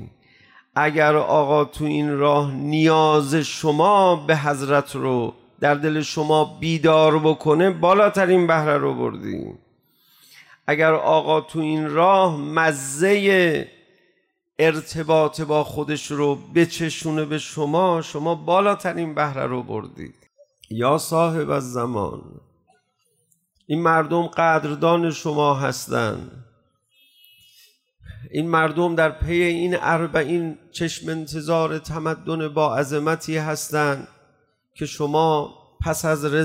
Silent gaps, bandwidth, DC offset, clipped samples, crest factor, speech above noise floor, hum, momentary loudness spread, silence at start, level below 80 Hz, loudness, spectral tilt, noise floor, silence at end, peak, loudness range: none; 16 kHz; under 0.1%; under 0.1%; 14 dB; 48 dB; none; 11 LU; 0 s; -50 dBFS; -20 LUFS; -5.5 dB/octave; -68 dBFS; 0 s; -6 dBFS; 6 LU